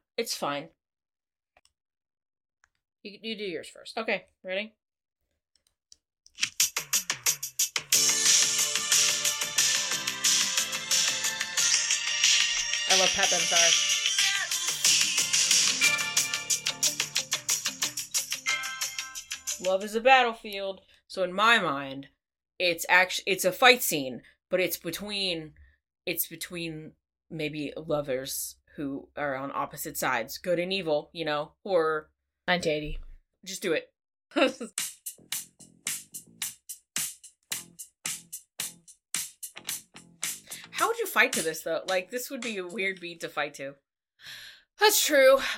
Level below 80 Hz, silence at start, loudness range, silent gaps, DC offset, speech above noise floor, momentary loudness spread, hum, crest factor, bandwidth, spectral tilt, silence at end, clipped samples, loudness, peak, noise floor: -58 dBFS; 0.2 s; 14 LU; none; under 0.1%; 35 dB; 17 LU; none; 26 dB; 17 kHz; -0.5 dB/octave; 0 s; under 0.1%; -26 LUFS; -4 dBFS; -63 dBFS